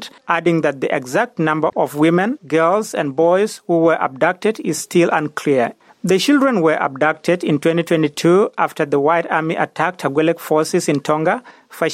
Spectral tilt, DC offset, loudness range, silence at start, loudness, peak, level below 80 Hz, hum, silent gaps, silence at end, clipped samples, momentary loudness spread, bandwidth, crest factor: -5.5 dB/octave; under 0.1%; 1 LU; 0 s; -17 LUFS; -2 dBFS; -66 dBFS; none; none; 0 s; under 0.1%; 5 LU; 15.5 kHz; 14 dB